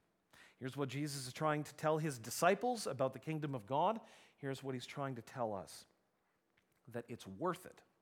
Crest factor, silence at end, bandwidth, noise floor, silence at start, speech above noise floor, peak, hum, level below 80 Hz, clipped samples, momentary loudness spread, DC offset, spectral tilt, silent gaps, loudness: 24 dB; 0.2 s; 19 kHz; -81 dBFS; 0.35 s; 41 dB; -16 dBFS; none; -84 dBFS; under 0.1%; 14 LU; under 0.1%; -5 dB/octave; none; -40 LUFS